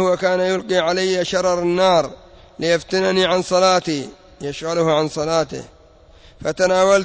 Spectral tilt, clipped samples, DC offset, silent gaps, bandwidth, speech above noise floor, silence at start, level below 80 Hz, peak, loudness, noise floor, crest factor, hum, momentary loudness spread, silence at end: -4 dB/octave; under 0.1%; under 0.1%; none; 8 kHz; 30 dB; 0 s; -50 dBFS; -6 dBFS; -18 LUFS; -47 dBFS; 14 dB; none; 12 LU; 0 s